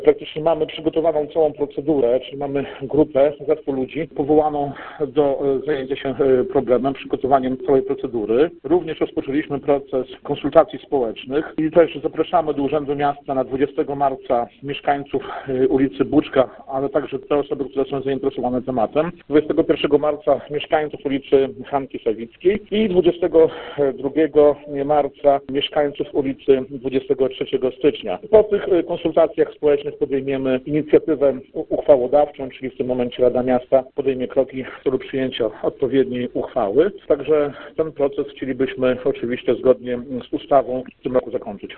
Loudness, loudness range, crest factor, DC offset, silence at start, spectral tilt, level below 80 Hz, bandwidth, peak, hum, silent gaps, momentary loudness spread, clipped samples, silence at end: -20 LUFS; 3 LU; 18 dB; under 0.1%; 0 s; -10.5 dB/octave; -48 dBFS; 4.3 kHz; 0 dBFS; none; none; 8 LU; under 0.1%; 0 s